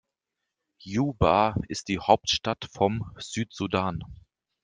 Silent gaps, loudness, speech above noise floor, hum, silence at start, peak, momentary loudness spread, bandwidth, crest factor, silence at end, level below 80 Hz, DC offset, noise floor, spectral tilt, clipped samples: none; -26 LUFS; 58 dB; none; 0.85 s; -4 dBFS; 11 LU; 10 kHz; 24 dB; 0.5 s; -48 dBFS; under 0.1%; -85 dBFS; -5 dB/octave; under 0.1%